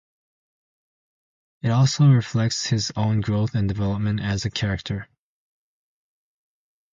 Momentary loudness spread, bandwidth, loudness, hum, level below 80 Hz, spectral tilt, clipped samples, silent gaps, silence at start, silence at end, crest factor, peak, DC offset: 10 LU; 7.6 kHz; -22 LUFS; none; -46 dBFS; -5.5 dB/octave; under 0.1%; none; 1.65 s; 1.9 s; 18 dB; -6 dBFS; under 0.1%